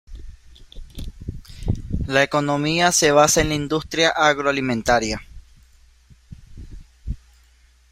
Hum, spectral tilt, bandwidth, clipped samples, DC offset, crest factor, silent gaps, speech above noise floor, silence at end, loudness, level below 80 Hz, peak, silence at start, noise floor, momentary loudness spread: none; -3.5 dB/octave; 16 kHz; under 0.1%; under 0.1%; 20 dB; none; 36 dB; 0.75 s; -19 LUFS; -36 dBFS; -2 dBFS; 0.1 s; -54 dBFS; 22 LU